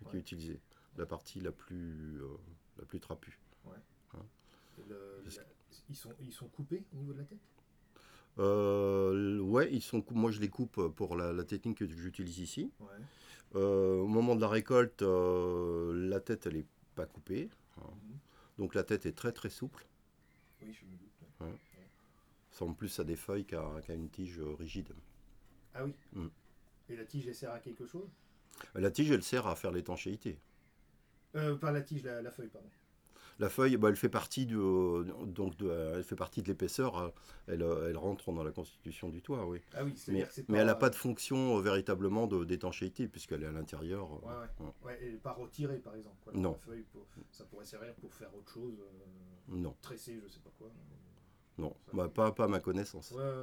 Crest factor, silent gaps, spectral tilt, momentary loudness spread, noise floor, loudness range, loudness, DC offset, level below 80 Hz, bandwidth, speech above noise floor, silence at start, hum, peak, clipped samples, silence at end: 22 dB; none; -6.5 dB/octave; 22 LU; -68 dBFS; 15 LU; -37 LUFS; under 0.1%; -60 dBFS; over 20 kHz; 31 dB; 0 s; none; -16 dBFS; under 0.1%; 0 s